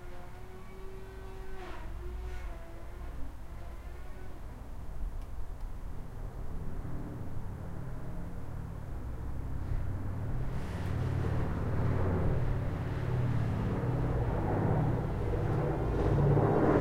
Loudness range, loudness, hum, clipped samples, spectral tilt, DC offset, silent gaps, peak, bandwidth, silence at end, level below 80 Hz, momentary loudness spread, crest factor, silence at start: 14 LU; -35 LUFS; none; under 0.1%; -9 dB/octave; under 0.1%; none; -16 dBFS; 15 kHz; 0 s; -40 dBFS; 17 LU; 18 dB; 0 s